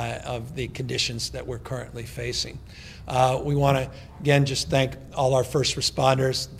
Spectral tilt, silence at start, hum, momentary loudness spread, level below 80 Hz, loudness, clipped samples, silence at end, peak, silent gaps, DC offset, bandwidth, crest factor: -4.5 dB/octave; 0 s; none; 13 LU; -46 dBFS; -25 LUFS; under 0.1%; 0 s; -4 dBFS; none; under 0.1%; 15.5 kHz; 20 dB